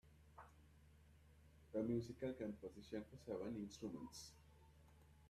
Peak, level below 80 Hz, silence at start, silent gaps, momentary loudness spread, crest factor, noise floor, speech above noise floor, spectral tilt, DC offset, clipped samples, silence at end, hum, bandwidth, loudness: -32 dBFS; -72 dBFS; 0.05 s; none; 24 LU; 20 dB; -68 dBFS; 20 dB; -6.5 dB/octave; under 0.1%; under 0.1%; 0 s; none; 14 kHz; -49 LUFS